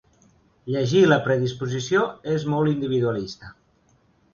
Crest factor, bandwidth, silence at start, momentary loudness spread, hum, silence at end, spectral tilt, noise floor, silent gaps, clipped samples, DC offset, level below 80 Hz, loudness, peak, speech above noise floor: 20 dB; 7.2 kHz; 0.65 s; 13 LU; none; 0.8 s; -6.5 dB/octave; -62 dBFS; none; under 0.1%; under 0.1%; -58 dBFS; -22 LUFS; -4 dBFS; 40 dB